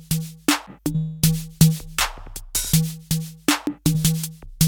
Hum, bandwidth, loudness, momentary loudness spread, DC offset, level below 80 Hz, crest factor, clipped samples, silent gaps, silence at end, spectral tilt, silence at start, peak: none; 20 kHz; -22 LUFS; 8 LU; under 0.1%; -38 dBFS; 20 dB; under 0.1%; none; 0 s; -4 dB/octave; 0 s; -2 dBFS